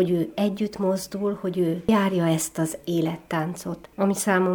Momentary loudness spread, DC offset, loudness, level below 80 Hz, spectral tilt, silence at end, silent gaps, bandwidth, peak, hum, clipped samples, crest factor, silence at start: 7 LU; under 0.1%; -25 LUFS; -58 dBFS; -5.5 dB/octave; 0 s; none; over 20 kHz; -6 dBFS; none; under 0.1%; 18 dB; 0 s